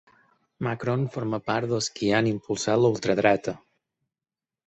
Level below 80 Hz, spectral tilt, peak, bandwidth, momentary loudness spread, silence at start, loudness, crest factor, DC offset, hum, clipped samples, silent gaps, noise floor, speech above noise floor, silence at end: -60 dBFS; -5.5 dB/octave; -6 dBFS; 8.4 kHz; 9 LU; 0.6 s; -25 LUFS; 20 dB; under 0.1%; none; under 0.1%; none; under -90 dBFS; over 65 dB; 1.1 s